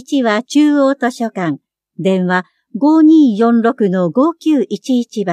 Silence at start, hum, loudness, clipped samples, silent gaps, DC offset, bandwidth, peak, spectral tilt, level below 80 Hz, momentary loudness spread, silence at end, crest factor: 0.1 s; none; -13 LUFS; under 0.1%; none; under 0.1%; 10.5 kHz; -2 dBFS; -6.5 dB/octave; -72 dBFS; 10 LU; 0 s; 12 dB